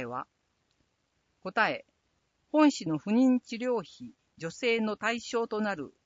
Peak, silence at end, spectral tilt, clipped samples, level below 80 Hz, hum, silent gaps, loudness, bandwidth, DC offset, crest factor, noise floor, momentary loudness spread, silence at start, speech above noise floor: -10 dBFS; 0.15 s; -5 dB/octave; under 0.1%; -74 dBFS; none; none; -29 LUFS; 7.8 kHz; under 0.1%; 20 dB; -76 dBFS; 18 LU; 0 s; 47 dB